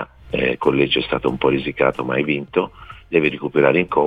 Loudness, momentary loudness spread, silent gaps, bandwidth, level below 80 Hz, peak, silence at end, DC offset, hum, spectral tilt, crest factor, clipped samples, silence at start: -19 LUFS; 6 LU; none; 5 kHz; -46 dBFS; -2 dBFS; 0 s; 0.1%; none; -7.5 dB/octave; 18 dB; under 0.1%; 0 s